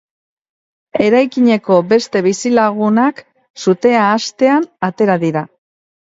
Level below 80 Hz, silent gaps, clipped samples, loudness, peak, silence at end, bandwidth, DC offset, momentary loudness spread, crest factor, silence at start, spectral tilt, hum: -60 dBFS; 3.50-3.54 s; under 0.1%; -14 LUFS; 0 dBFS; 0.65 s; 8 kHz; under 0.1%; 8 LU; 14 dB; 0.95 s; -5.5 dB/octave; none